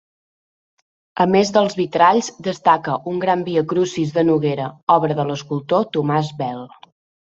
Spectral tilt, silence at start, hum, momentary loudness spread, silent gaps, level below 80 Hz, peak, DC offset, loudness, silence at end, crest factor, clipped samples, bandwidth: -6 dB/octave; 1.15 s; none; 10 LU; 4.83-4.87 s; -60 dBFS; -2 dBFS; under 0.1%; -18 LUFS; 0.65 s; 18 dB; under 0.1%; 8 kHz